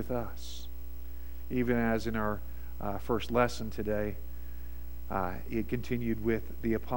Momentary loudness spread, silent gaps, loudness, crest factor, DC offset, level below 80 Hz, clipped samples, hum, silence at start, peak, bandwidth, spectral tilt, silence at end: 16 LU; none; -34 LUFS; 22 dB; 1%; -44 dBFS; under 0.1%; none; 0 s; -12 dBFS; 16.5 kHz; -6.5 dB/octave; 0 s